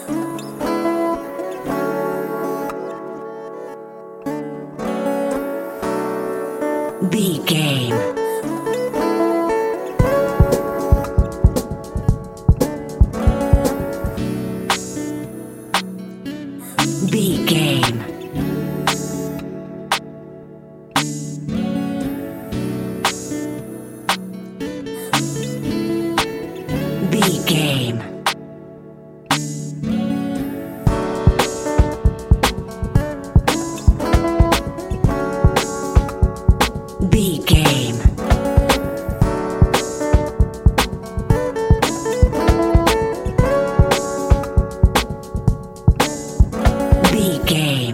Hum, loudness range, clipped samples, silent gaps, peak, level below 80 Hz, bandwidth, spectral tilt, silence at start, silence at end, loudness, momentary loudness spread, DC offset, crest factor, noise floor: none; 7 LU; under 0.1%; none; 0 dBFS; -24 dBFS; 17 kHz; -5.5 dB/octave; 0 s; 0 s; -19 LUFS; 11 LU; under 0.1%; 18 dB; -39 dBFS